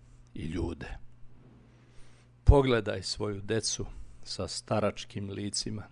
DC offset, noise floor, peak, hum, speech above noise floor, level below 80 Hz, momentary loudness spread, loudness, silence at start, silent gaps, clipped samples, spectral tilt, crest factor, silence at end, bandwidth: under 0.1%; -57 dBFS; -6 dBFS; none; 25 dB; -36 dBFS; 19 LU; -31 LUFS; 0.15 s; none; under 0.1%; -5 dB/octave; 26 dB; 0.05 s; 11 kHz